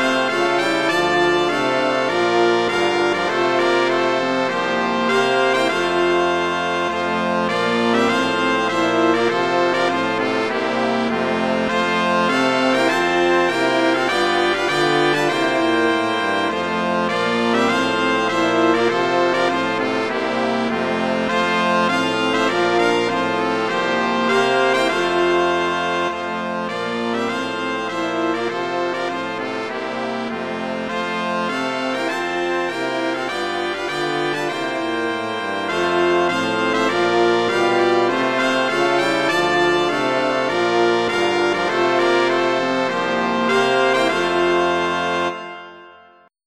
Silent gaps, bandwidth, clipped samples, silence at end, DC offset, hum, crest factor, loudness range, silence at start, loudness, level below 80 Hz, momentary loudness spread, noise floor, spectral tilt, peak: none; 12.5 kHz; under 0.1%; 0.5 s; 0.2%; none; 16 dB; 5 LU; 0 s; -18 LUFS; -58 dBFS; 6 LU; -50 dBFS; -4 dB/octave; -2 dBFS